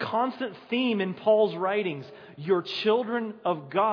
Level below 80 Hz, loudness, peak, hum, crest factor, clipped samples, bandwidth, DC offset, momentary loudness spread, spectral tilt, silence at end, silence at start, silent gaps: -82 dBFS; -27 LUFS; -10 dBFS; none; 16 dB; under 0.1%; 5.4 kHz; under 0.1%; 11 LU; -7 dB/octave; 0 s; 0 s; none